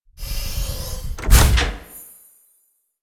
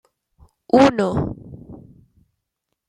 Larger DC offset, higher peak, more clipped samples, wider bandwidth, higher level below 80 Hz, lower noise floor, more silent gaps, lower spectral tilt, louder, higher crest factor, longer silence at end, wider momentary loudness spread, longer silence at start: neither; about the same, -2 dBFS vs -2 dBFS; neither; first, 16 kHz vs 10.5 kHz; first, -22 dBFS vs -46 dBFS; second, -64 dBFS vs -78 dBFS; neither; second, -3.5 dB/octave vs -6.5 dB/octave; about the same, -20 LUFS vs -18 LUFS; about the same, 20 dB vs 20 dB; about the same, 1 s vs 1.1 s; about the same, 23 LU vs 25 LU; second, 0.2 s vs 0.75 s